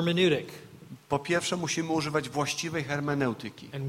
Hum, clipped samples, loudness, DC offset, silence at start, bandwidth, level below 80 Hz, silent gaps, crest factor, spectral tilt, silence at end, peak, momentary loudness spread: none; under 0.1%; -29 LUFS; under 0.1%; 0 s; 16.5 kHz; -64 dBFS; none; 18 dB; -4.5 dB/octave; 0 s; -12 dBFS; 16 LU